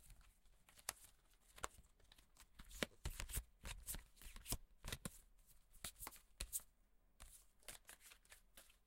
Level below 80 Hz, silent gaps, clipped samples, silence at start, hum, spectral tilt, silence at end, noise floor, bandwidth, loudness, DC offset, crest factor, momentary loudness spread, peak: -60 dBFS; none; under 0.1%; 0 s; none; -2.5 dB/octave; 0.1 s; -75 dBFS; 16.5 kHz; -52 LUFS; under 0.1%; 36 dB; 18 LU; -18 dBFS